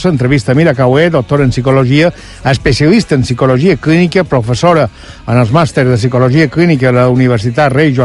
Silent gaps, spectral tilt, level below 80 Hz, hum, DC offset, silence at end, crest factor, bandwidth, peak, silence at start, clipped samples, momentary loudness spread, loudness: none; -7 dB/octave; -32 dBFS; none; under 0.1%; 0 s; 8 dB; 11.5 kHz; 0 dBFS; 0 s; 0.4%; 4 LU; -10 LUFS